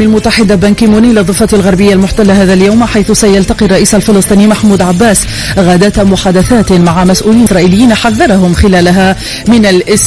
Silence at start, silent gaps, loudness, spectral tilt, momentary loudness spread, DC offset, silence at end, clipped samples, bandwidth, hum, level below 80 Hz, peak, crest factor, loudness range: 0 s; none; -6 LUFS; -5 dB/octave; 2 LU; 0.8%; 0 s; 5%; 11 kHz; none; -22 dBFS; 0 dBFS; 6 dB; 0 LU